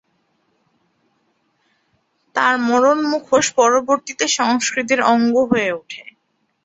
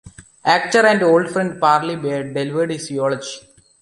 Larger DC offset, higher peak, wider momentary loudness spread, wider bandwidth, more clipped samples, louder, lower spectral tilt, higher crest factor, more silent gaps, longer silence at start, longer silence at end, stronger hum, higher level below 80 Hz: neither; about the same, -2 dBFS vs 0 dBFS; about the same, 9 LU vs 10 LU; second, 8.2 kHz vs 11.5 kHz; neither; about the same, -17 LUFS vs -18 LUFS; second, -2.5 dB/octave vs -4.5 dB/octave; about the same, 18 dB vs 18 dB; neither; first, 2.35 s vs 0.05 s; first, 0.65 s vs 0.4 s; neither; about the same, -62 dBFS vs -58 dBFS